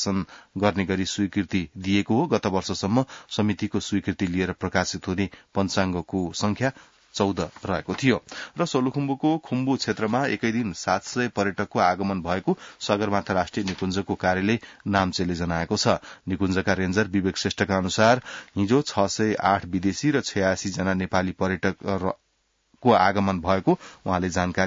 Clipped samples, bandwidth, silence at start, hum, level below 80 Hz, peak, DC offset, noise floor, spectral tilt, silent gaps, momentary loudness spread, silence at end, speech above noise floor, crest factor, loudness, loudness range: under 0.1%; 7.8 kHz; 0 s; none; -56 dBFS; -6 dBFS; under 0.1%; -70 dBFS; -5 dB/octave; none; 6 LU; 0 s; 46 dB; 20 dB; -25 LUFS; 3 LU